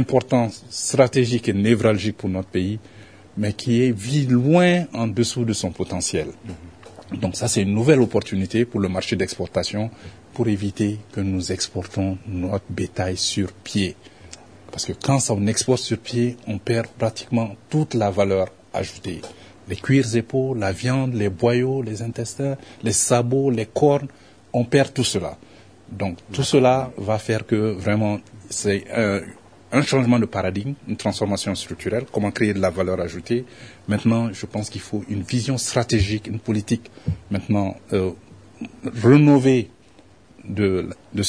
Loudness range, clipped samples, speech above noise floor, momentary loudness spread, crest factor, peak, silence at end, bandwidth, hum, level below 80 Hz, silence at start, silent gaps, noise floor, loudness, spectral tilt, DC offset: 4 LU; under 0.1%; 30 dB; 12 LU; 20 dB; -2 dBFS; 0 s; 11 kHz; none; -50 dBFS; 0 s; none; -51 dBFS; -22 LUFS; -5.5 dB/octave; 0.1%